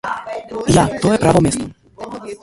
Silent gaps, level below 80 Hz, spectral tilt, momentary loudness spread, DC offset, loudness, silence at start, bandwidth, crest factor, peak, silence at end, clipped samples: none; -36 dBFS; -5.5 dB/octave; 18 LU; under 0.1%; -16 LUFS; 0.05 s; 11.5 kHz; 16 dB; 0 dBFS; 0.05 s; under 0.1%